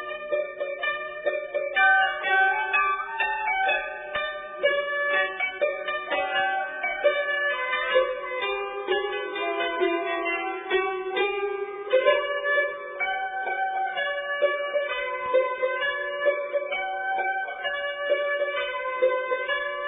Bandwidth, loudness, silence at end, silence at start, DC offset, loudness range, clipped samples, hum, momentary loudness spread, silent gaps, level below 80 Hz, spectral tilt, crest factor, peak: 3.9 kHz; -25 LUFS; 0 s; 0 s; under 0.1%; 3 LU; under 0.1%; none; 7 LU; none; -64 dBFS; -5.5 dB/octave; 20 dB; -6 dBFS